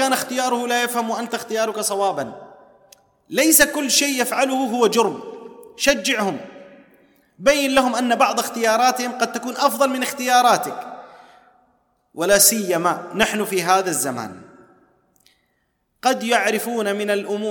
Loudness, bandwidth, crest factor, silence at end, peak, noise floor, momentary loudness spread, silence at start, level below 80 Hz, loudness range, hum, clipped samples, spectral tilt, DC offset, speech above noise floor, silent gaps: -19 LUFS; 19 kHz; 20 dB; 0 s; 0 dBFS; -69 dBFS; 11 LU; 0 s; -56 dBFS; 5 LU; none; under 0.1%; -2 dB/octave; under 0.1%; 50 dB; none